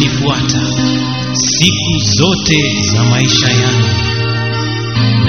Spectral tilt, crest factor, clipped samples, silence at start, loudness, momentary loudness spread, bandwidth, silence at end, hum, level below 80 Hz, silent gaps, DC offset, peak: -4 dB/octave; 12 dB; under 0.1%; 0 s; -12 LUFS; 6 LU; 6.8 kHz; 0 s; none; -34 dBFS; none; 1%; 0 dBFS